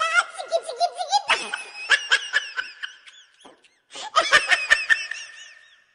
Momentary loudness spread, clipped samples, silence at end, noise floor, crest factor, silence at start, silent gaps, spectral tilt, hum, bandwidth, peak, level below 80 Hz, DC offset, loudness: 19 LU; under 0.1%; 0.4 s; -53 dBFS; 20 dB; 0 s; none; 1.5 dB/octave; none; 13.5 kHz; -4 dBFS; -62 dBFS; under 0.1%; -21 LUFS